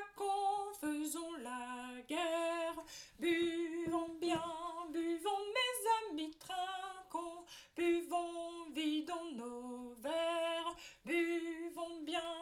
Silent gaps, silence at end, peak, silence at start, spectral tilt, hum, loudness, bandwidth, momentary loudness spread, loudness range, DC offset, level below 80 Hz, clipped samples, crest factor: none; 0 s; -24 dBFS; 0 s; -3 dB/octave; none; -40 LUFS; 16 kHz; 10 LU; 2 LU; under 0.1%; -74 dBFS; under 0.1%; 16 dB